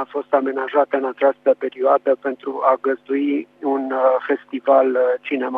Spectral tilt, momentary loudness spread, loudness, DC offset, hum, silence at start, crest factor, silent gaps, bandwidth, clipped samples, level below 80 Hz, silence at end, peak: -7 dB/octave; 6 LU; -19 LUFS; under 0.1%; 50 Hz at -70 dBFS; 0 s; 18 dB; none; 4 kHz; under 0.1%; -80 dBFS; 0 s; -2 dBFS